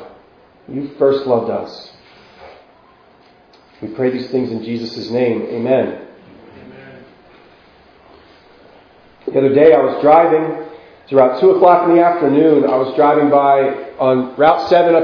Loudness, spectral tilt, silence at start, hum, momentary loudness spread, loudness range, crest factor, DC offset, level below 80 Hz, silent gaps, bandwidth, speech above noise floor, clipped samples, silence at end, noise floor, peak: -13 LUFS; -8 dB/octave; 0 s; none; 17 LU; 12 LU; 16 dB; under 0.1%; -58 dBFS; none; 5.4 kHz; 35 dB; under 0.1%; 0 s; -48 dBFS; 0 dBFS